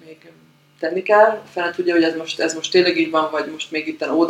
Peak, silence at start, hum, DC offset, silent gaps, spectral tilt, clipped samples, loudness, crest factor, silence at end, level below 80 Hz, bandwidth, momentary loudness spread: 0 dBFS; 0.05 s; none; under 0.1%; none; -3.5 dB/octave; under 0.1%; -19 LUFS; 18 dB; 0 s; -72 dBFS; 11 kHz; 11 LU